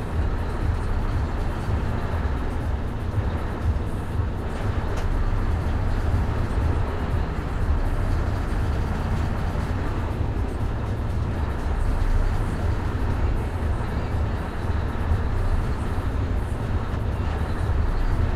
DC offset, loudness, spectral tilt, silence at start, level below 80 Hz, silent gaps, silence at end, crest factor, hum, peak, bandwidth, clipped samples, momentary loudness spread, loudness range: under 0.1%; -27 LUFS; -7.5 dB/octave; 0 s; -26 dBFS; none; 0 s; 14 dB; none; -10 dBFS; 12 kHz; under 0.1%; 3 LU; 1 LU